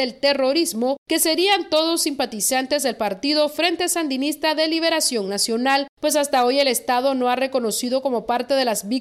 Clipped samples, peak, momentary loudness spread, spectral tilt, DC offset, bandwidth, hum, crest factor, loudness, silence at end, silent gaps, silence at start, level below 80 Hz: under 0.1%; -6 dBFS; 4 LU; -1.5 dB/octave; under 0.1%; 16 kHz; none; 16 dB; -20 LUFS; 0 s; 0.98-1.06 s, 5.89-5.97 s; 0 s; -62 dBFS